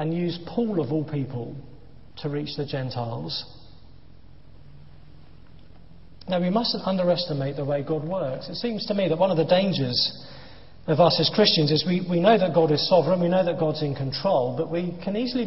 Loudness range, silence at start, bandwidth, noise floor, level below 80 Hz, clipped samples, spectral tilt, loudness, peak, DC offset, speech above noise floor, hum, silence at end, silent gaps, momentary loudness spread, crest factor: 13 LU; 0 s; 6 kHz; -51 dBFS; -56 dBFS; under 0.1%; -8.5 dB/octave; -24 LUFS; -4 dBFS; 0.6%; 27 dB; none; 0 s; none; 13 LU; 20 dB